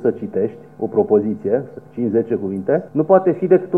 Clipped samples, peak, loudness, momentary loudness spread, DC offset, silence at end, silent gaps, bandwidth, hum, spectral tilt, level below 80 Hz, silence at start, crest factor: under 0.1%; -2 dBFS; -19 LUFS; 9 LU; 0.2%; 0 s; none; 3.1 kHz; none; -11.5 dB/octave; -64 dBFS; 0 s; 16 dB